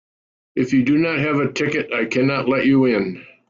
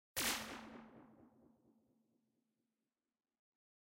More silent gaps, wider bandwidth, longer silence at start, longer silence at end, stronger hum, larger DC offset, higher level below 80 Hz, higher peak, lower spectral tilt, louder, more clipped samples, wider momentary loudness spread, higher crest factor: neither; second, 7.4 kHz vs 16 kHz; first, 0.55 s vs 0.15 s; second, 0.25 s vs 2.55 s; neither; neither; first, -58 dBFS vs -74 dBFS; first, -6 dBFS vs -26 dBFS; first, -6.5 dB/octave vs -1 dB/octave; first, -19 LUFS vs -42 LUFS; neither; second, 7 LU vs 23 LU; second, 14 dB vs 24 dB